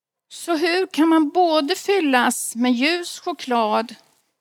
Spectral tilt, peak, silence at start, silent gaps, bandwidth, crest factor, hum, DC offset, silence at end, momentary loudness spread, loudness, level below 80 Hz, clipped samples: -2 dB/octave; 0 dBFS; 0.3 s; none; 17 kHz; 20 dB; none; under 0.1%; 0.45 s; 9 LU; -20 LUFS; -80 dBFS; under 0.1%